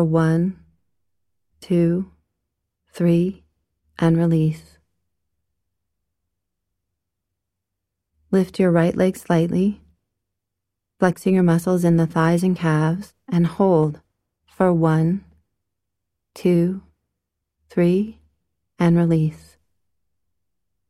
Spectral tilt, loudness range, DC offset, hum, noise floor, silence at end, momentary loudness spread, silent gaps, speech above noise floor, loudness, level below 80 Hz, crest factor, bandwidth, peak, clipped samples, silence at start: -8.5 dB/octave; 5 LU; under 0.1%; none; -82 dBFS; 1.5 s; 9 LU; none; 64 dB; -20 LUFS; -56 dBFS; 20 dB; 13 kHz; -2 dBFS; under 0.1%; 0 s